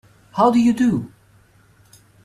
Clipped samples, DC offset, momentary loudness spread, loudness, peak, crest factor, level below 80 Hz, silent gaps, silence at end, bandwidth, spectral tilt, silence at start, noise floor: under 0.1%; under 0.1%; 15 LU; -17 LUFS; -4 dBFS; 18 dB; -56 dBFS; none; 1.2 s; 11.5 kHz; -7 dB/octave; 0.35 s; -54 dBFS